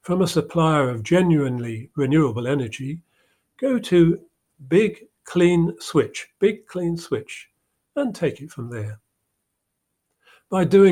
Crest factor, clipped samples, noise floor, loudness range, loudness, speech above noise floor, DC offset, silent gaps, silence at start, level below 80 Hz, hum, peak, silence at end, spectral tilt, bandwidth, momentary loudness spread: 18 dB; under 0.1%; -77 dBFS; 9 LU; -21 LUFS; 57 dB; under 0.1%; none; 0.05 s; -56 dBFS; none; -4 dBFS; 0 s; -7 dB/octave; 13.5 kHz; 15 LU